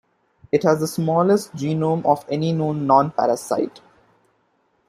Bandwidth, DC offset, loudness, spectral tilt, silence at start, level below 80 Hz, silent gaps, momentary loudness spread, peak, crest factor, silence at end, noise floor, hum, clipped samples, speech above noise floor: 15.5 kHz; under 0.1%; -20 LUFS; -7 dB/octave; 0.55 s; -62 dBFS; none; 7 LU; -2 dBFS; 18 dB; 1.1 s; -65 dBFS; none; under 0.1%; 46 dB